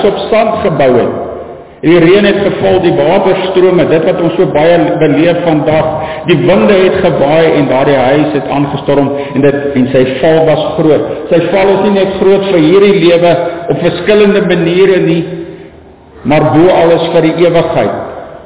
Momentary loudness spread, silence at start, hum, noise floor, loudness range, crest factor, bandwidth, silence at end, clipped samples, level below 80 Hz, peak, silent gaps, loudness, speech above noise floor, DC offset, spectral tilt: 7 LU; 0 s; none; -35 dBFS; 2 LU; 8 dB; 4 kHz; 0 s; 0.4%; -38 dBFS; 0 dBFS; none; -8 LUFS; 27 dB; 1%; -11 dB/octave